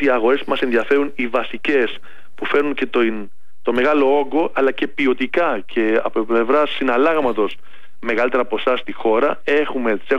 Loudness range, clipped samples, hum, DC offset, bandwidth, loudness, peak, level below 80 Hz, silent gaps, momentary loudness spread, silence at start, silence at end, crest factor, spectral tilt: 2 LU; under 0.1%; none; 5%; 7.8 kHz; -18 LUFS; -6 dBFS; -60 dBFS; none; 6 LU; 0 s; 0 s; 12 dB; -6 dB/octave